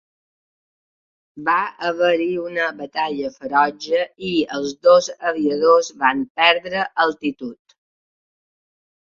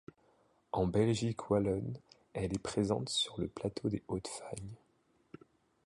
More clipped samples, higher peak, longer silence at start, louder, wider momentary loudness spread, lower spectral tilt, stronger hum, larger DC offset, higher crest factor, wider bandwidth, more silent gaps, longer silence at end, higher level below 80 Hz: neither; first, -2 dBFS vs -18 dBFS; first, 1.35 s vs 0.75 s; first, -19 LUFS vs -36 LUFS; second, 10 LU vs 14 LU; second, -3.5 dB/octave vs -5.5 dB/octave; neither; neither; about the same, 18 dB vs 18 dB; second, 7.6 kHz vs 11.5 kHz; first, 6.30-6.35 s vs none; first, 1.5 s vs 1.1 s; second, -64 dBFS vs -58 dBFS